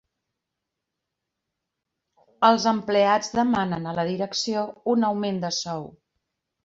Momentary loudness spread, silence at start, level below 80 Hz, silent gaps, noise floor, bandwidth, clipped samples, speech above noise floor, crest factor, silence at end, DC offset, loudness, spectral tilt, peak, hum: 8 LU; 2.4 s; -64 dBFS; none; -84 dBFS; 7.8 kHz; under 0.1%; 61 dB; 22 dB; 0.75 s; under 0.1%; -23 LUFS; -4.5 dB/octave; -4 dBFS; none